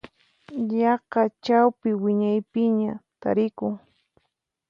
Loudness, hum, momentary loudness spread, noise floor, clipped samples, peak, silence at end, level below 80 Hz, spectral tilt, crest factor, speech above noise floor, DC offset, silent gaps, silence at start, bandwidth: -24 LUFS; none; 11 LU; -77 dBFS; under 0.1%; -6 dBFS; 0.95 s; -68 dBFS; -8 dB/octave; 18 dB; 54 dB; under 0.1%; none; 0.5 s; 6.6 kHz